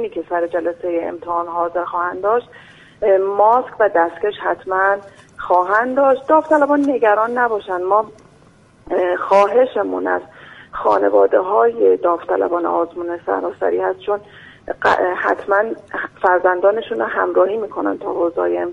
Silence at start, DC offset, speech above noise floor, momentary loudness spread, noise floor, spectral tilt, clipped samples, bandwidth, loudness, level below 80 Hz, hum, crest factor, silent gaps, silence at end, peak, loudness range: 0 s; under 0.1%; 32 dB; 9 LU; -49 dBFS; -6 dB/octave; under 0.1%; 9.8 kHz; -17 LUFS; -56 dBFS; none; 16 dB; none; 0 s; -2 dBFS; 4 LU